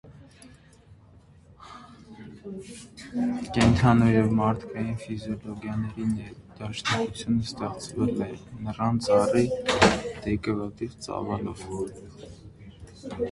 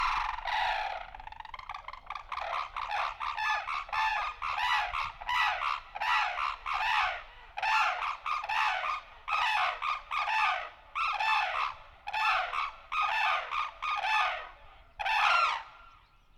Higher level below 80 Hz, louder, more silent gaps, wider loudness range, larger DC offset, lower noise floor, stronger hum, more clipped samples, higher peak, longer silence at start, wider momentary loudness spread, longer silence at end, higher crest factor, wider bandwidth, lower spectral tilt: first, -46 dBFS vs -56 dBFS; first, -26 LUFS vs -31 LUFS; neither; first, 8 LU vs 4 LU; neither; second, -53 dBFS vs -59 dBFS; neither; neither; first, -2 dBFS vs -14 dBFS; about the same, 0.05 s vs 0 s; first, 25 LU vs 13 LU; second, 0 s vs 0.4 s; first, 24 dB vs 18 dB; second, 11.5 kHz vs 15.5 kHz; first, -6 dB/octave vs 0 dB/octave